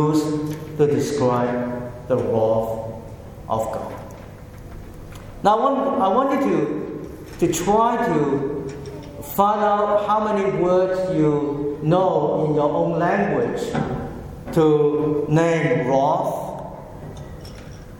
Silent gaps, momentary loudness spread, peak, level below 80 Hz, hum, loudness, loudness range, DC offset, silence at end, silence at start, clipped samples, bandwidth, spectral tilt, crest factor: none; 18 LU; -2 dBFS; -44 dBFS; none; -20 LUFS; 5 LU; under 0.1%; 0 s; 0 s; under 0.1%; 17.5 kHz; -6.5 dB/octave; 18 dB